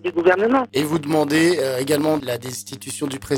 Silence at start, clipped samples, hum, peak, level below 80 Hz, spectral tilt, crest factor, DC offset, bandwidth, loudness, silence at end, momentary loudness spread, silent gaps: 0.05 s; under 0.1%; none; -4 dBFS; -54 dBFS; -4.5 dB/octave; 16 dB; under 0.1%; 17.5 kHz; -20 LUFS; 0 s; 11 LU; none